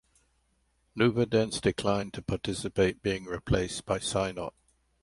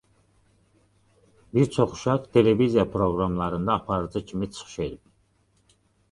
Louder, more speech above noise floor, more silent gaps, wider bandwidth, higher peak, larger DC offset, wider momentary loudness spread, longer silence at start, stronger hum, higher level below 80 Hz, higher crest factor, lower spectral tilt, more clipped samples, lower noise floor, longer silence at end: second, -30 LUFS vs -25 LUFS; about the same, 43 dB vs 42 dB; neither; about the same, 11.5 kHz vs 11.5 kHz; second, -12 dBFS vs -4 dBFS; neither; second, 8 LU vs 12 LU; second, 0.95 s vs 1.55 s; neither; about the same, -48 dBFS vs -48 dBFS; about the same, 20 dB vs 22 dB; second, -5 dB/octave vs -7 dB/octave; neither; first, -72 dBFS vs -65 dBFS; second, 0.55 s vs 1.15 s